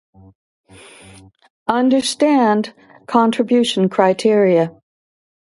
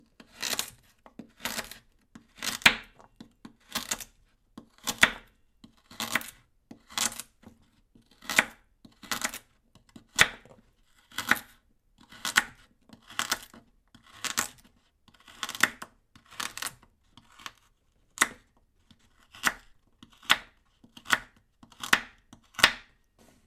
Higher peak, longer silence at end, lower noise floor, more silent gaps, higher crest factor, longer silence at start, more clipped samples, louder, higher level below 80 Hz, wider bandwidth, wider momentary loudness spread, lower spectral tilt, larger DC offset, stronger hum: about the same, 0 dBFS vs -2 dBFS; first, 0.9 s vs 0.65 s; second, -44 dBFS vs -67 dBFS; neither; second, 18 dB vs 30 dB; first, 1.7 s vs 0.4 s; neither; first, -16 LUFS vs -28 LUFS; about the same, -62 dBFS vs -60 dBFS; second, 11.5 kHz vs 15.5 kHz; second, 7 LU vs 23 LU; first, -5 dB/octave vs 0 dB/octave; neither; neither